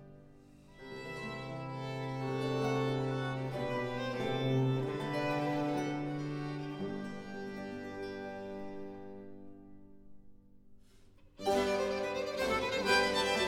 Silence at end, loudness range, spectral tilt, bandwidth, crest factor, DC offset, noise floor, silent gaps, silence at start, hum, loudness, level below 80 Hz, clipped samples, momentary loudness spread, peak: 0 s; 11 LU; -5.5 dB/octave; 16 kHz; 20 dB; under 0.1%; -59 dBFS; none; 0 s; none; -35 LUFS; -62 dBFS; under 0.1%; 15 LU; -16 dBFS